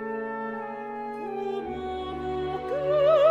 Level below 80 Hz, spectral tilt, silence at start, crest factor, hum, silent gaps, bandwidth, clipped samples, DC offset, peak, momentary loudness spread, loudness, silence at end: -52 dBFS; -7 dB/octave; 0 s; 18 dB; none; none; 7.6 kHz; under 0.1%; under 0.1%; -10 dBFS; 13 LU; -29 LUFS; 0 s